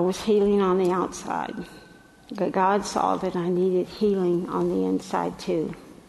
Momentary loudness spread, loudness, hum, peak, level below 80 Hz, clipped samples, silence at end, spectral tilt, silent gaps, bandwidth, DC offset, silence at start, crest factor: 9 LU; -24 LUFS; none; -8 dBFS; -56 dBFS; under 0.1%; 0.15 s; -6.5 dB/octave; none; 12 kHz; under 0.1%; 0 s; 16 dB